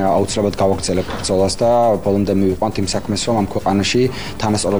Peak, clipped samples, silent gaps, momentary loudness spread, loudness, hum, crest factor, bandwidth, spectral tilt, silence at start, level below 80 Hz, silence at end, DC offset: -4 dBFS; under 0.1%; none; 5 LU; -17 LUFS; none; 12 dB; over 20 kHz; -5 dB/octave; 0 s; -38 dBFS; 0 s; 2%